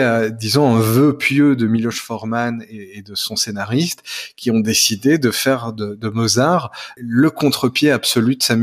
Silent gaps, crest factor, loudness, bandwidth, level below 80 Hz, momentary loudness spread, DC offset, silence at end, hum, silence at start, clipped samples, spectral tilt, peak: none; 14 dB; -16 LUFS; 15.5 kHz; -58 dBFS; 12 LU; under 0.1%; 0 s; none; 0 s; under 0.1%; -4.5 dB/octave; -2 dBFS